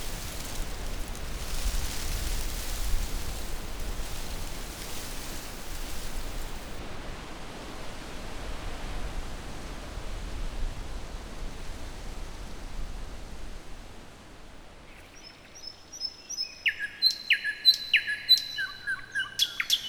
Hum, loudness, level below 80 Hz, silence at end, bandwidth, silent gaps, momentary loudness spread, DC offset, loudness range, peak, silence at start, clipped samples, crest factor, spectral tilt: none; -30 LUFS; -36 dBFS; 0 s; over 20 kHz; none; 20 LU; under 0.1%; 19 LU; -10 dBFS; 0 s; under 0.1%; 22 dB; -1.5 dB/octave